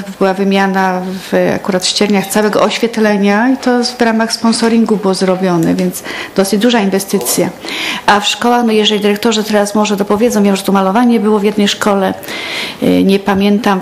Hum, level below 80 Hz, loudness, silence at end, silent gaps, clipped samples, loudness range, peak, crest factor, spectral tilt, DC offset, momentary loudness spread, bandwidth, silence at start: none; -50 dBFS; -12 LUFS; 0 s; none; 0.2%; 1 LU; 0 dBFS; 12 dB; -4.5 dB/octave; under 0.1%; 5 LU; 15.5 kHz; 0 s